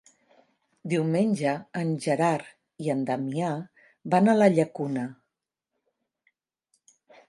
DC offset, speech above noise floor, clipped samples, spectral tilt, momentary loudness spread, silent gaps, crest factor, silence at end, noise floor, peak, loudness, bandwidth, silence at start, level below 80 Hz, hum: under 0.1%; 60 dB; under 0.1%; -7 dB/octave; 15 LU; none; 22 dB; 2.15 s; -85 dBFS; -6 dBFS; -26 LUFS; 11.5 kHz; 0.85 s; -74 dBFS; none